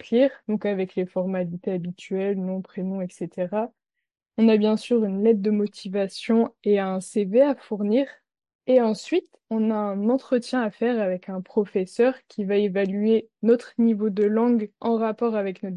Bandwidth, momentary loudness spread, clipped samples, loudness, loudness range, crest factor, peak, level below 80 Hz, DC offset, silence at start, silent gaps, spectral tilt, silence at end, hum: 11.5 kHz; 9 LU; under 0.1%; -24 LUFS; 4 LU; 16 dB; -8 dBFS; -74 dBFS; under 0.1%; 0.05 s; 8.55-8.59 s; -7 dB/octave; 0 s; none